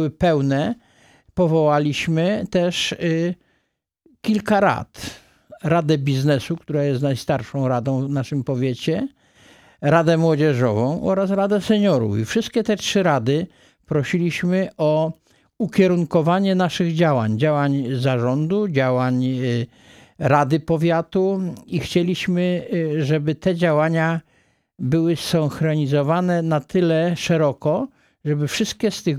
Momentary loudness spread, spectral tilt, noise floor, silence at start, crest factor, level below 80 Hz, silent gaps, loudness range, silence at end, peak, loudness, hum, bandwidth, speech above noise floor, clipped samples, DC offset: 8 LU; -6.5 dB/octave; -71 dBFS; 0 s; 18 dB; -54 dBFS; none; 3 LU; 0 s; -2 dBFS; -20 LUFS; none; 14.5 kHz; 52 dB; under 0.1%; under 0.1%